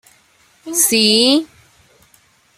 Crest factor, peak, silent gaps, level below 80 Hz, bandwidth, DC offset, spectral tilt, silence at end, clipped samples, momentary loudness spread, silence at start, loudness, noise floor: 18 dB; 0 dBFS; none; -62 dBFS; 16 kHz; under 0.1%; -1.5 dB/octave; 1.15 s; under 0.1%; 11 LU; 0.65 s; -13 LUFS; -54 dBFS